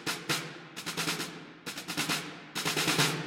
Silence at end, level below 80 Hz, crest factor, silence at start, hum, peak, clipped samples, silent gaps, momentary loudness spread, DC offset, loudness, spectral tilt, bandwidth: 0 s; -72 dBFS; 20 dB; 0 s; none; -14 dBFS; under 0.1%; none; 13 LU; under 0.1%; -32 LUFS; -2.5 dB/octave; 16.5 kHz